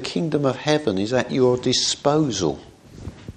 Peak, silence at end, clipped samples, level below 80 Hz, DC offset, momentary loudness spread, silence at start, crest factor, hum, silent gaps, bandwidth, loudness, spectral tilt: -4 dBFS; 0.05 s; under 0.1%; -50 dBFS; under 0.1%; 18 LU; 0 s; 18 dB; none; none; 9.8 kHz; -21 LUFS; -4.5 dB/octave